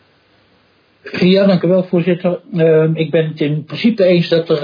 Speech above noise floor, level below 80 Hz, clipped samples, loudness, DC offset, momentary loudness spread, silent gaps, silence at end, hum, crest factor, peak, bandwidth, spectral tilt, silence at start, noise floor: 41 dB; -60 dBFS; under 0.1%; -14 LUFS; under 0.1%; 7 LU; none; 0 s; none; 14 dB; 0 dBFS; 5.2 kHz; -9 dB/octave; 1.05 s; -54 dBFS